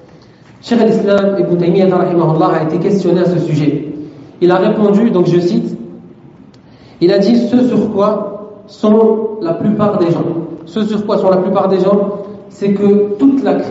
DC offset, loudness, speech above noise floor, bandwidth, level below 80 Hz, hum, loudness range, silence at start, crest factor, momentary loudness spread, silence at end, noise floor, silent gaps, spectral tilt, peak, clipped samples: under 0.1%; -12 LUFS; 29 dB; 8 kHz; -54 dBFS; none; 2 LU; 0.65 s; 12 dB; 12 LU; 0 s; -40 dBFS; none; -7.5 dB/octave; 0 dBFS; under 0.1%